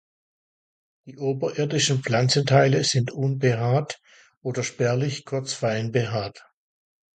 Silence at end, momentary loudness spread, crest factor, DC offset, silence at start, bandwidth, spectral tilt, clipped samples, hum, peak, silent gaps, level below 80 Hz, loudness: 0.8 s; 12 LU; 20 dB; under 0.1%; 1.05 s; 9.4 kHz; -5 dB/octave; under 0.1%; none; -4 dBFS; 4.37-4.41 s; -60 dBFS; -23 LUFS